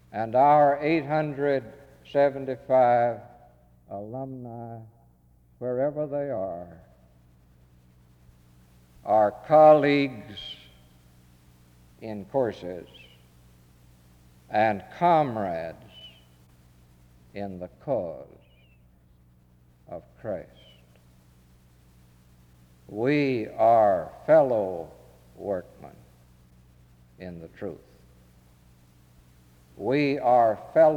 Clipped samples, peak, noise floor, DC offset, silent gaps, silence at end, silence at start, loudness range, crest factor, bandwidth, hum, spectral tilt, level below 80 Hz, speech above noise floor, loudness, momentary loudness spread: under 0.1%; -6 dBFS; -59 dBFS; under 0.1%; none; 0 s; 0.15 s; 20 LU; 20 dB; 7.6 kHz; 60 Hz at -60 dBFS; -8 dB/octave; -62 dBFS; 35 dB; -24 LUFS; 23 LU